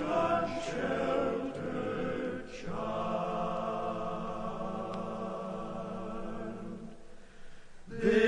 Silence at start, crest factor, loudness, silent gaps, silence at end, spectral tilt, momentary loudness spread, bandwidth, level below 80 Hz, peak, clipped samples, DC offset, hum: 0 s; 20 dB; -35 LUFS; none; 0 s; -6.5 dB/octave; 10 LU; 10.5 kHz; -54 dBFS; -14 dBFS; under 0.1%; under 0.1%; none